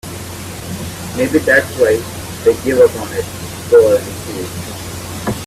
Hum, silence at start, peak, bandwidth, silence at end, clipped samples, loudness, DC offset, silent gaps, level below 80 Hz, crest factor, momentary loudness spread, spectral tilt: none; 0.05 s; 0 dBFS; 16 kHz; 0 s; under 0.1%; -15 LUFS; under 0.1%; none; -42 dBFS; 16 dB; 15 LU; -4.5 dB/octave